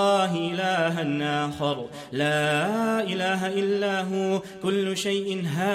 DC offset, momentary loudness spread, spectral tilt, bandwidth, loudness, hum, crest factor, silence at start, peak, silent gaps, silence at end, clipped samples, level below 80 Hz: under 0.1%; 5 LU; -5 dB/octave; 15 kHz; -25 LUFS; none; 14 dB; 0 s; -12 dBFS; none; 0 s; under 0.1%; -66 dBFS